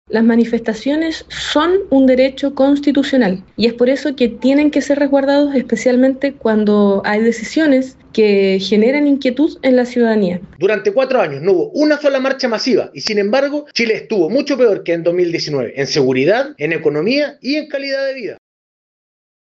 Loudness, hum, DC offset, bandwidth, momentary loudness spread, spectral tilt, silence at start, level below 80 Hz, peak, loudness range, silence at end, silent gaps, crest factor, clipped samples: -15 LUFS; none; under 0.1%; 8.2 kHz; 6 LU; -5.5 dB/octave; 0.1 s; -52 dBFS; -2 dBFS; 2 LU; 1.2 s; none; 12 dB; under 0.1%